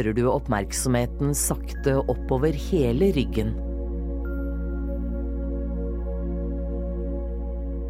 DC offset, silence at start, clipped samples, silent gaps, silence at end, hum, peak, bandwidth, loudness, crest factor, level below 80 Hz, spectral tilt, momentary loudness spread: under 0.1%; 0 s; under 0.1%; none; 0 s; none; -8 dBFS; 16 kHz; -26 LUFS; 16 dB; -30 dBFS; -6 dB/octave; 8 LU